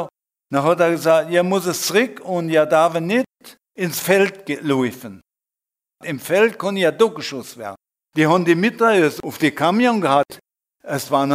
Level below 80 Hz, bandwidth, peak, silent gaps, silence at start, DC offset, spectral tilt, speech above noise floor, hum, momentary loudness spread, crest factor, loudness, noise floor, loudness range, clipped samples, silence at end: -66 dBFS; 16 kHz; -2 dBFS; none; 0 s; under 0.1%; -5 dB/octave; 71 dB; none; 14 LU; 18 dB; -18 LUFS; -89 dBFS; 4 LU; under 0.1%; 0 s